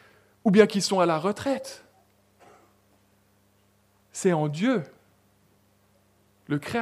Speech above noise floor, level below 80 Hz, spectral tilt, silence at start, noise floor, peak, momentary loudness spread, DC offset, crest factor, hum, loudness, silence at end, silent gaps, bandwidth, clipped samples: 41 dB; -68 dBFS; -5.5 dB/octave; 0.45 s; -64 dBFS; -2 dBFS; 21 LU; under 0.1%; 26 dB; 50 Hz at -60 dBFS; -24 LUFS; 0 s; none; 15 kHz; under 0.1%